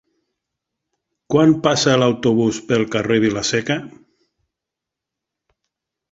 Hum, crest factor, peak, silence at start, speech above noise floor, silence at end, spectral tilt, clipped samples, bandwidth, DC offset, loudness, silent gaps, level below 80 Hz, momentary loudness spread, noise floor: none; 18 dB; -2 dBFS; 1.3 s; 67 dB; 2.25 s; -5 dB/octave; under 0.1%; 8 kHz; under 0.1%; -17 LUFS; none; -54 dBFS; 6 LU; -84 dBFS